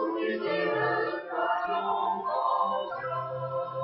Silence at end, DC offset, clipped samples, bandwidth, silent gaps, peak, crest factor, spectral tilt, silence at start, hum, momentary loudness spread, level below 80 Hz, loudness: 0 s; under 0.1%; under 0.1%; 6 kHz; none; -16 dBFS; 14 dB; -8.5 dB/octave; 0 s; none; 6 LU; -72 dBFS; -29 LUFS